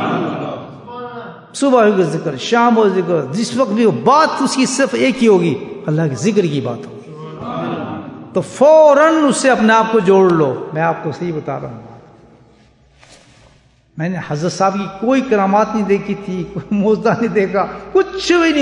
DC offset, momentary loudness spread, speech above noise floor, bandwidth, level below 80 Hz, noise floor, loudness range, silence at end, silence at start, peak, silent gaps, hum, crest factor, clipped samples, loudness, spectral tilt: under 0.1%; 16 LU; 37 dB; 11 kHz; -52 dBFS; -51 dBFS; 11 LU; 0 s; 0 s; 0 dBFS; none; none; 14 dB; under 0.1%; -14 LUFS; -5.5 dB/octave